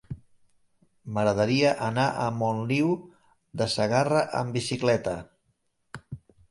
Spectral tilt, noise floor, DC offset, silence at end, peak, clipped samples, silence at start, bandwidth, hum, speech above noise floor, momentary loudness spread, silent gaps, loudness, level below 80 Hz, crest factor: -5.5 dB/octave; -73 dBFS; under 0.1%; 0.35 s; -8 dBFS; under 0.1%; 0.1 s; 11.5 kHz; none; 48 dB; 20 LU; none; -26 LUFS; -58 dBFS; 18 dB